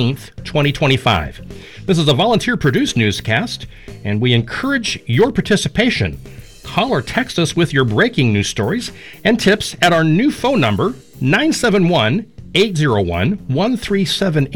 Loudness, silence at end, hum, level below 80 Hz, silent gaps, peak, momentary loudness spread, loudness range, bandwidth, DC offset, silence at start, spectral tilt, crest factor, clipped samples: -16 LUFS; 0 s; none; -40 dBFS; none; -2 dBFS; 9 LU; 2 LU; 18.5 kHz; 0.6%; 0 s; -5.5 dB/octave; 14 dB; under 0.1%